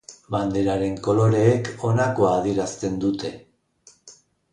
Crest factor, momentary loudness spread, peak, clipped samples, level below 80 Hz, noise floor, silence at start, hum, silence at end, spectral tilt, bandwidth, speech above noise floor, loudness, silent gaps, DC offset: 18 dB; 8 LU; -6 dBFS; under 0.1%; -50 dBFS; -56 dBFS; 0.1 s; none; 0.4 s; -7 dB/octave; 10.5 kHz; 35 dB; -22 LUFS; none; under 0.1%